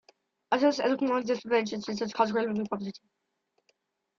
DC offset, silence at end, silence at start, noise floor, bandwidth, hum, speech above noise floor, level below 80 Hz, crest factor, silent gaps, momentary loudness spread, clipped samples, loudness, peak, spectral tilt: under 0.1%; 1.2 s; 0.5 s; -74 dBFS; 7.4 kHz; none; 45 dB; -72 dBFS; 20 dB; none; 9 LU; under 0.1%; -29 LUFS; -10 dBFS; -5 dB/octave